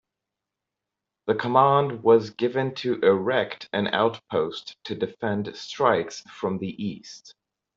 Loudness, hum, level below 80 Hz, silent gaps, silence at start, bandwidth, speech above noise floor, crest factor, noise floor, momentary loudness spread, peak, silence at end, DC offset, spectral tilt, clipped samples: -24 LUFS; none; -66 dBFS; none; 1.25 s; 7.6 kHz; 62 dB; 20 dB; -86 dBFS; 15 LU; -4 dBFS; 0.45 s; under 0.1%; -6 dB/octave; under 0.1%